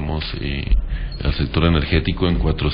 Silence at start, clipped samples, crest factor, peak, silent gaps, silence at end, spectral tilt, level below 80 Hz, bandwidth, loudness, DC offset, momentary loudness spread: 0 s; under 0.1%; 16 dB; -4 dBFS; none; 0 s; -11.5 dB/octave; -22 dBFS; 5.2 kHz; -21 LUFS; under 0.1%; 7 LU